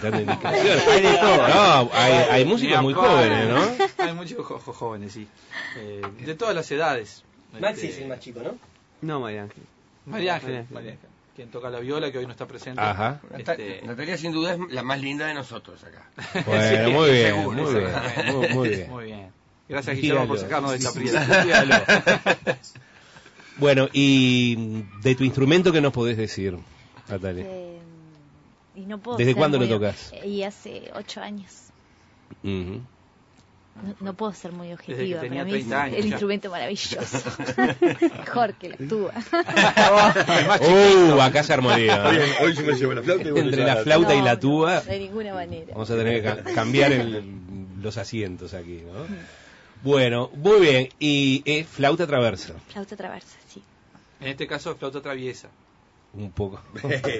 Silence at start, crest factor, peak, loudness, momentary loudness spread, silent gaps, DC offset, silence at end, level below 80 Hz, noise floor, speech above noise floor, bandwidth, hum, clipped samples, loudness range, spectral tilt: 0 s; 16 dB; -6 dBFS; -21 LUFS; 21 LU; none; under 0.1%; 0 s; -54 dBFS; -58 dBFS; 36 dB; 8 kHz; none; under 0.1%; 16 LU; -5 dB/octave